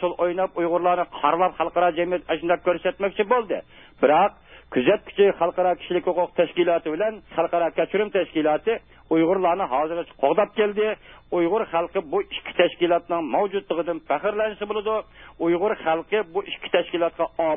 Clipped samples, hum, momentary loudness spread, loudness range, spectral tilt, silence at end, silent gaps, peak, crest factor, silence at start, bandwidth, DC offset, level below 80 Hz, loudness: under 0.1%; none; 6 LU; 3 LU; -10 dB/octave; 0 s; none; -4 dBFS; 18 dB; 0 s; 3.8 kHz; 0.1%; -56 dBFS; -23 LUFS